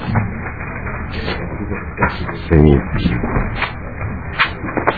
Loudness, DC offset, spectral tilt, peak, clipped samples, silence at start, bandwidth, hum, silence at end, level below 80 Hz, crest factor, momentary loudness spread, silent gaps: -19 LUFS; 1%; -9.5 dB/octave; 0 dBFS; 0.2%; 0 s; 4.9 kHz; none; 0 s; -26 dBFS; 18 dB; 13 LU; none